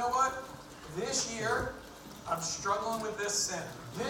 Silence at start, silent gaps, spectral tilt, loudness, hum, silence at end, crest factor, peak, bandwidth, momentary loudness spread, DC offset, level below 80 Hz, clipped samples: 0 s; none; -2 dB/octave; -33 LUFS; none; 0 s; 18 dB; -18 dBFS; 18 kHz; 15 LU; under 0.1%; -58 dBFS; under 0.1%